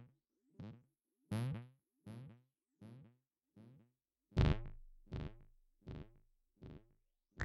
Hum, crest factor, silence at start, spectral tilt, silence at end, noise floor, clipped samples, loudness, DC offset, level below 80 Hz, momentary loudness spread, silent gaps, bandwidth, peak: none; 26 dB; 0 s; -7.5 dB/octave; 0 s; -80 dBFS; under 0.1%; -44 LUFS; under 0.1%; -52 dBFS; 27 LU; none; 12 kHz; -20 dBFS